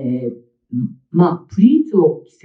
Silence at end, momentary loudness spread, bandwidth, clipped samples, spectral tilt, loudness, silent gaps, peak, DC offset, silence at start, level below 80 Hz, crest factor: 0.25 s; 12 LU; 6.2 kHz; under 0.1%; -10.5 dB/octave; -16 LUFS; none; 0 dBFS; under 0.1%; 0 s; -64 dBFS; 16 dB